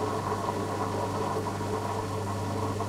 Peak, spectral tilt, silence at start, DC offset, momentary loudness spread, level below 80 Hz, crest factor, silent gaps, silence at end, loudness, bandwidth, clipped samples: -16 dBFS; -6 dB/octave; 0 s; under 0.1%; 2 LU; -54 dBFS; 14 dB; none; 0 s; -31 LUFS; 16 kHz; under 0.1%